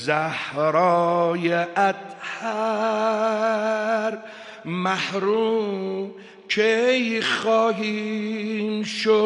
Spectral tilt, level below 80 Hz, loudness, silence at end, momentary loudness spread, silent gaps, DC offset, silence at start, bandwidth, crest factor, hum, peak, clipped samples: -5 dB/octave; -76 dBFS; -23 LUFS; 0 s; 10 LU; none; under 0.1%; 0 s; 11 kHz; 16 dB; none; -6 dBFS; under 0.1%